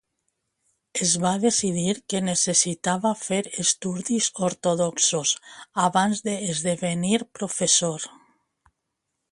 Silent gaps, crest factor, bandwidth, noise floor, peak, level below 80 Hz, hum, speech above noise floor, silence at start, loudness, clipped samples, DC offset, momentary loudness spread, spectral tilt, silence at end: none; 20 dB; 11.5 kHz; -80 dBFS; -6 dBFS; -66 dBFS; none; 56 dB; 0.95 s; -23 LUFS; under 0.1%; under 0.1%; 7 LU; -3 dB/octave; 1.2 s